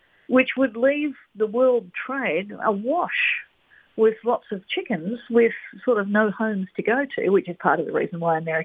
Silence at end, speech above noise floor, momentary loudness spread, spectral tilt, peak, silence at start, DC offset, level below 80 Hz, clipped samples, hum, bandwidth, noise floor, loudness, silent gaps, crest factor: 0 s; 35 dB; 8 LU; -8.5 dB/octave; -4 dBFS; 0.3 s; under 0.1%; -70 dBFS; under 0.1%; none; 3.9 kHz; -57 dBFS; -23 LUFS; none; 20 dB